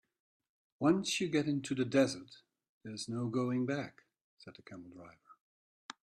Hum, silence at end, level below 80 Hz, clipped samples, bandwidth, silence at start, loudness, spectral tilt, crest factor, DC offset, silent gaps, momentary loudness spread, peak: none; 0.7 s; -76 dBFS; under 0.1%; 13 kHz; 0.8 s; -34 LUFS; -5 dB/octave; 22 dB; under 0.1%; 2.69-2.81 s, 4.21-4.37 s; 23 LU; -16 dBFS